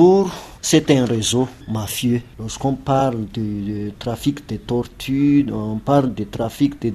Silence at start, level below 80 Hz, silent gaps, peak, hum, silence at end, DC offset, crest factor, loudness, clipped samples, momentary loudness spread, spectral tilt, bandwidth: 0 s; -44 dBFS; none; -2 dBFS; none; 0 s; under 0.1%; 18 dB; -20 LUFS; under 0.1%; 9 LU; -5.5 dB/octave; 14.5 kHz